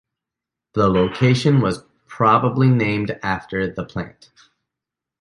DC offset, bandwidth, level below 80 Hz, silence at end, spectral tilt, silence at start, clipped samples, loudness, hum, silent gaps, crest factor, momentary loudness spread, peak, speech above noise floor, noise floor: under 0.1%; 11 kHz; -46 dBFS; 1.1 s; -7.5 dB/octave; 0.75 s; under 0.1%; -19 LUFS; none; none; 18 dB; 13 LU; -2 dBFS; 67 dB; -86 dBFS